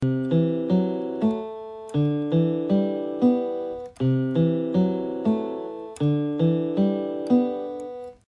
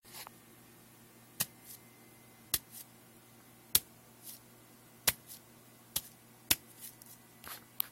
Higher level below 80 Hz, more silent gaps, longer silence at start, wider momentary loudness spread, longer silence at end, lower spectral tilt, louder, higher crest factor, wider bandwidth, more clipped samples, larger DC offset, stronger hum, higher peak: first, -60 dBFS vs -68 dBFS; neither; about the same, 0 s vs 0.05 s; second, 10 LU vs 26 LU; first, 0.15 s vs 0 s; first, -9.5 dB/octave vs -0.5 dB/octave; first, -24 LUFS vs -35 LUFS; second, 16 dB vs 38 dB; second, 10.5 kHz vs 16.5 kHz; neither; neither; neither; second, -8 dBFS vs -4 dBFS